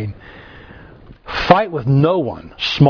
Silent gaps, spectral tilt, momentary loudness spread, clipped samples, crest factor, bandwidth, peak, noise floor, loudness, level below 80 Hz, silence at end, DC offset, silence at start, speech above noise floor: none; -7.5 dB/octave; 18 LU; under 0.1%; 18 dB; 5.4 kHz; 0 dBFS; -41 dBFS; -16 LUFS; -42 dBFS; 0 s; under 0.1%; 0 s; 25 dB